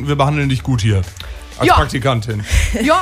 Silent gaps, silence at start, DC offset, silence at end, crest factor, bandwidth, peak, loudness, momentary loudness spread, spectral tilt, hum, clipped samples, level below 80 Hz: none; 0 s; under 0.1%; 0 s; 14 dB; 16 kHz; 0 dBFS; -16 LUFS; 10 LU; -5.5 dB/octave; none; under 0.1%; -24 dBFS